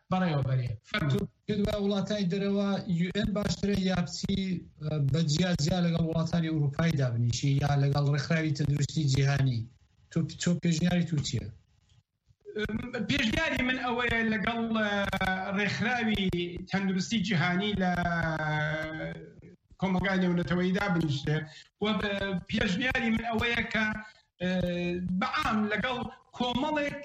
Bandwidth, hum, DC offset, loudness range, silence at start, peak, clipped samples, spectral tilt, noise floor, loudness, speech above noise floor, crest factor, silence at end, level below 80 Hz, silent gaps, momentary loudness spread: 9.8 kHz; none; under 0.1%; 3 LU; 0.1 s; -14 dBFS; under 0.1%; -6 dB/octave; -67 dBFS; -29 LUFS; 38 dB; 16 dB; 0 s; -50 dBFS; none; 7 LU